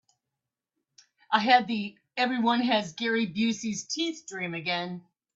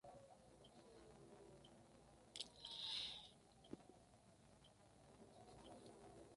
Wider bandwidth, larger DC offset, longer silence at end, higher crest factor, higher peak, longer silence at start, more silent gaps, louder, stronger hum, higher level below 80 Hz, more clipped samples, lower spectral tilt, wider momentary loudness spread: second, 7.8 kHz vs 11.5 kHz; neither; first, 0.35 s vs 0 s; second, 22 dB vs 28 dB; first, -8 dBFS vs -30 dBFS; first, 1.3 s vs 0.05 s; neither; first, -27 LUFS vs -55 LUFS; neither; about the same, -74 dBFS vs -78 dBFS; neither; about the same, -3.5 dB/octave vs -2.5 dB/octave; second, 12 LU vs 21 LU